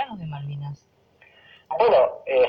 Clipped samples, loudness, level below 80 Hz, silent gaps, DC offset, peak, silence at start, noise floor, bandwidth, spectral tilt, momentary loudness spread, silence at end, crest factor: under 0.1%; -22 LUFS; -62 dBFS; none; under 0.1%; -6 dBFS; 0 s; -58 dBFS; 5.4 kHz; -8 dB/octave; 18 LU; 0 s; 18 dB